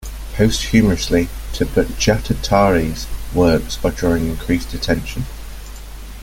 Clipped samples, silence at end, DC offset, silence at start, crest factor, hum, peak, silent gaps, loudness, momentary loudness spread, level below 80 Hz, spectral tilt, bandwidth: under 0.1%; 0 s; under 0.1%; 0 s; 16 dB; none; -2 dBFS; none; -18 LUFS; 16 LU; -28 dBFS; -5.5 dB/octave; 17 kHz